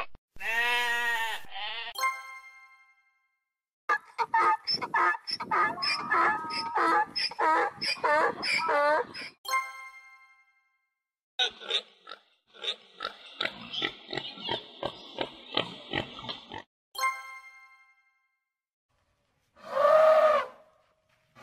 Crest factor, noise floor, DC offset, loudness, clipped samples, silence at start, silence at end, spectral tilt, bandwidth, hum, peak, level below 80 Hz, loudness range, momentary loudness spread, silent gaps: 20 dB; -81 dBFS; under 0.1%; -28 LUFS; under 0.1%; 0 s; 0 s; -2 dB/octave; 16 kHz; none; -10 dBFS; -68 dBFS; 9 LU; 15 LU; 0.18-0.28 s, 3.73-3.88 s, 9.38-9.44 s, 11.23-11.38 s, 16.67-16.92 s, 18.73-18.89 s